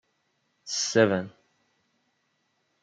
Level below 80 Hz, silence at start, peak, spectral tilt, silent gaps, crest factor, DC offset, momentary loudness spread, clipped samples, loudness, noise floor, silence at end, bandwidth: -76 dBFS; 0.65 s; -6 dBFS; -3.5 dB/octave; none; 24 dB; under 0.1%; 21 LU; under 0.1%; -25 LUFS; -74 dBFS; 1.55 s; 9.4 kHz